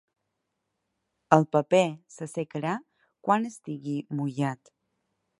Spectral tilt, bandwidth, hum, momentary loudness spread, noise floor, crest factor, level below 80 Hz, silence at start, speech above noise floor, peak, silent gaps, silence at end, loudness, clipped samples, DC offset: -6.5 dB/octave; 11.5 kHz; none; 14 LU; -81 dBFS; 28 dB; -74 dBFS; 1.3 s; 54 dB; -2 dBFS; none; 0.85 s; -27 LUFS; under 0.1%; under 0.1%